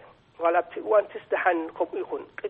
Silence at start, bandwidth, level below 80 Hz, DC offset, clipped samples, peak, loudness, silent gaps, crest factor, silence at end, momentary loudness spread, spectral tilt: 0.4 s; 4 kHz; -70 dBFS; under 0.1%; under 0.1%; -8 dBFS; -26 LUFS; none; 18 dB; 0 s; 7 LU; -7.5 dB/octave